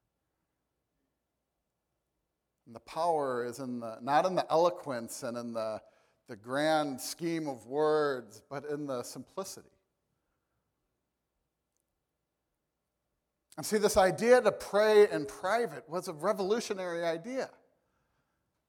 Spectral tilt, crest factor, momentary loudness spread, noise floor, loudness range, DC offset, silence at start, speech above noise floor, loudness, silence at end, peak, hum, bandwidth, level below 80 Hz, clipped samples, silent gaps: -4 dB/octave; 22 dB; 17 LU; -85 dBFS; 15 LU; under 0.1%; 2.7 s; 54 dB; -31 LUFS; 1.2 s; -12 dBFS; none; 18 kHz; -66 dBFS; under 0.1%; none